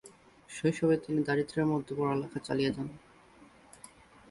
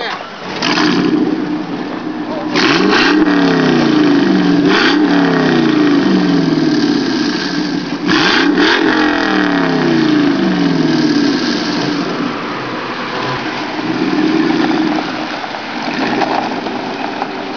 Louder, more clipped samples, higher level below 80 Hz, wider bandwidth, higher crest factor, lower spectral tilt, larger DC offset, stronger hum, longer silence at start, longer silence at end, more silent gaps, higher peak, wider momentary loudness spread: second, -31 LUFS vs -13 LUFS; neither; second, -64 dBFS vs -50 dBFS; first, 11.5 kHz vs 5.4 kHz; about the same, 18 dB vs 14 dB; about the same, -6.5 dB/octave vs -5.5 dB/octave; second, under 0.1% vs 0.4%; neither; about the same, 0.05 s vs 0 s; first, 0.45 s vs 0 s; neither; second, -16 dBFS vs 0 dBFS; first, 23 LU vs 10 LU